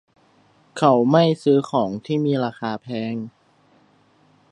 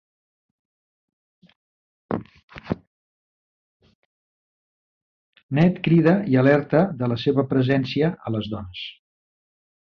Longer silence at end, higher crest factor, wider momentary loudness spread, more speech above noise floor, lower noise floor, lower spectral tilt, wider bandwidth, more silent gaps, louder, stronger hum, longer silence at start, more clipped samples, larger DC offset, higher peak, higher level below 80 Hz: first, 1.2 s vs 1 s; about the same, 20 dB vs 20 dB; about the same, 14 LU vs 15 LU; second, 38 dB vs over 70 dB; second, -58 dBFS vs under -90 dBFS; second, -7.5 dB/octave vs -9 dB/octave; first, 11 kHz vs 6.2 kHz; second, none vs 2.43-2.48 s, 2.87-3.80 s, 3.95-5.33 s, 5.43-5.49 s; about the same, -20 LUFS vs -21 LUFS; neither; second, 0.75 s vs 2.1 s; neither; neither; about the same, -2 dBFS vs -4 dBFS; second, -68 dBFS vs -54 dBFS